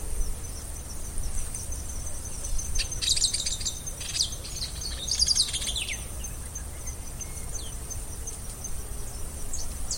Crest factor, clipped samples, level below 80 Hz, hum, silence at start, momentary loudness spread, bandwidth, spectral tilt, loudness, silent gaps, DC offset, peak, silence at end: 20 dB; under 0.1%; -36 dBFS; none; 0 s; 14 LU; 16.5 kHz; -1 dB/octave; -30 LUFS; none; under 0.1%; -10 dBFS; 0 s